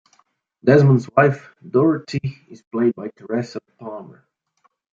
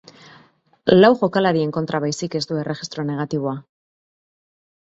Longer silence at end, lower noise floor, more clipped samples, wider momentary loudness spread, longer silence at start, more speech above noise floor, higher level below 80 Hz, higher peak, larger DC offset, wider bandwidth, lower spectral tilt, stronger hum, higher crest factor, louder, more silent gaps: second, 0.95 s vs 1.25 s; first, -65 dBFS vs -54 dBFS; neither; first, 20 LU vs 13 LU; second, 0.65 s vs 0.85 s; first, 46 dB vs 35 dB; about the same, -64 dBFS vs -60 dBFS; about the same, 0 dBFS vs 0 dBFS; neither; about the same, 7.4 kHz vs 8 kHz; first, -8.5 dB/octave vs -6 dB/octave; neither; about the same, 20 dB vs 20 dB; about the same, -19 LUFS vs -20 LUFS; first, 2.67-2.71 s vs none